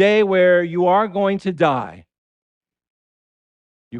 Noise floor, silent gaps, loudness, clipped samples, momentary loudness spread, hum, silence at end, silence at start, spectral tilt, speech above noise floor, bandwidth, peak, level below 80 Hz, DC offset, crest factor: under -90 dBFS; 2.18-2.61 s, 2.90-3.91 s; -17 LUFS; under 0.1%; 7 LU; none; 0 s; 0 s; -7 dB/octave; over 74 dB; 8.6 kHz; -4 dBFS; -62 dBFS; under 0.1%; 16 dB